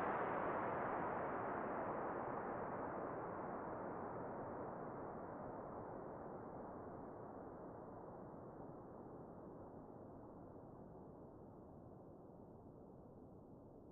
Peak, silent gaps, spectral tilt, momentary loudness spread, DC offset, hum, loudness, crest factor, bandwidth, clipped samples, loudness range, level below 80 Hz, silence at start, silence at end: -30 dBFS; none; -2.5 dB/octave; 17 LU; under 0.1%; none; -49 LUFS; 18 dB; 3.9 kHz; under 0.1%; 13 LU; -72 dBFS; 0 s; 0 s